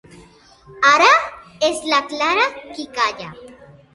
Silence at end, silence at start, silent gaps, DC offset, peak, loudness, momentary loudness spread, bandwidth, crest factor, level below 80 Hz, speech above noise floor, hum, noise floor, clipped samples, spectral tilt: 0.4 s; 0.7 s; none; under 0.1%; 0 dBFS; -16 LUFS; 19 LU; 11.5 kHz; 18 dB; -58 dBFS; 31 dB; none; -47 dBFS; under 0.1%; -1.5 dB/octave